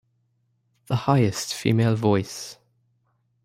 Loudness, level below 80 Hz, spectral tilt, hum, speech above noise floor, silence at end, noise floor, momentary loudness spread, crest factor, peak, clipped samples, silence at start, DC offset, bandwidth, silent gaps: -23 LUFS; -60 dBFS; -6 dB/octave; none; 47 dB; 0.9 s; -69 dBFS; 14 LU; 20 dB; -6 dBFS; under 0.1%; 0.9 s; under 0.1%; 16 kHz; none